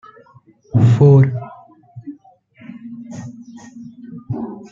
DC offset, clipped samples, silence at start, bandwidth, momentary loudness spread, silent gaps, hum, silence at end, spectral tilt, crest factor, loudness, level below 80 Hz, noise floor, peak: under 0.1%; under 0.1%; 0.75 s; 7.4 kHz; 27 LU; none; none; 0.1 s; -10 dB/octave; 16 dB; -15 LUFS; -52 dBFS; -49 dBFS; -2 dBFS